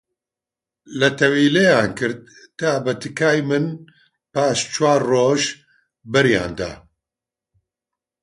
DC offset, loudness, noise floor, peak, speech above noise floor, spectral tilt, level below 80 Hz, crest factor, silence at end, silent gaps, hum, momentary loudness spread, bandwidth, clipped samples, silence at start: under 0.1%; -19 LUFS; -88 dBFS; -2 dBFS; 70 dB; -4.5 dB/octave; -52 dBFS; 20 dB; 1.45 s; none; none; 13 LU; 11.5 kHz; under 0.1%; 0.9 s